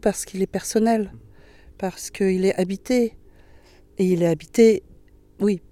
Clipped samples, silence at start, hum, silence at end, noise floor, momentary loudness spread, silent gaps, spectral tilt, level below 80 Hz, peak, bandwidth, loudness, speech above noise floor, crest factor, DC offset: under 0.1%; 0.05 s; none; 0.15 s; -50 dBFS; 13 LU; none; -6 dB/octave; -50 dBFS; -4 dBFS; 15.5 kHz; -22 LUFS; 29 dB; 18 dB; under 0.1%